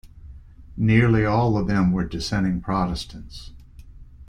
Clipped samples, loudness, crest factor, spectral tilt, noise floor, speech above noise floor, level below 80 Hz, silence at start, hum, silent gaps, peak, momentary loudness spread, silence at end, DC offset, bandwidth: under 0.1%; -22 LUFS; 18 dB; -7 dB/octave; -43 dBFS; 22 dB; -38 dBFS; 0.05 s; none; none; -4 dBFS; 21 LU; 0.05 s; under 0.1%; 10.5 kHz